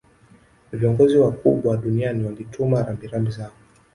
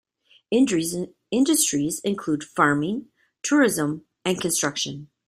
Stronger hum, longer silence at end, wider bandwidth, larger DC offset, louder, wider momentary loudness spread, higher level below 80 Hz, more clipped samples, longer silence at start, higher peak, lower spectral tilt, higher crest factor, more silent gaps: neither; first, 0.45 s vs 0.2 s; second, 11.5 kHz vs 15.5 kHz; neither; about the same, -21 LUFS vs -23 LUFS; first, 13 LU vs 10 LU; first, -50 dBFS vs -64 dBFS; neither; first, 0.7 s vs 0.5 s; about the same, -4 dBFS vs -4 dBFS; first, -9 dB/octave vs -3.5 dB/octave; about the same, 18 dB vs 20 dB; neither